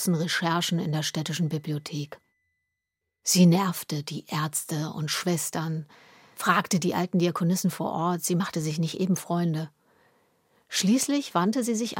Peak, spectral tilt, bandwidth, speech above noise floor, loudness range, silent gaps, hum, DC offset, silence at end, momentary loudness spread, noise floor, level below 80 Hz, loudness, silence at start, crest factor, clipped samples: -6 dBFS; -4.5 dB/octave; 17 kHz; 58 dB; 3 LU; none; none; under 0.1%; 0 s; 9 LU; -84 dBFS; -72 dBFS; -26 LUFS; 0 s; 20 dB; under 0.1%